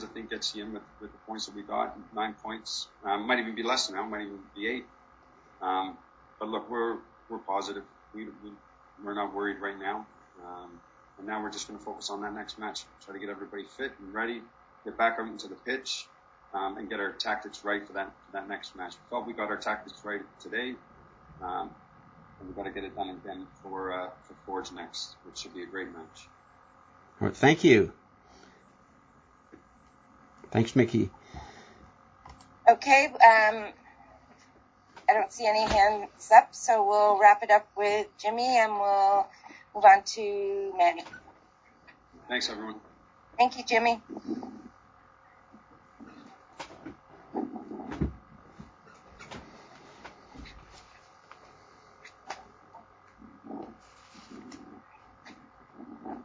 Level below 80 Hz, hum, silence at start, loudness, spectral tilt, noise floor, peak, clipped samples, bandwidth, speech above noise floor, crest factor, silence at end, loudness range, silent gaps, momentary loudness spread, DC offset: -58 dBFS; none; 0 s; -28 LUFS; -4 dB/octave; -60 dBFS; -4 dBFS; under 0.1%; 8 kHz; 33 dB; 28 dB; 0 s; 18 LU; none; 24 LU; under 0.1%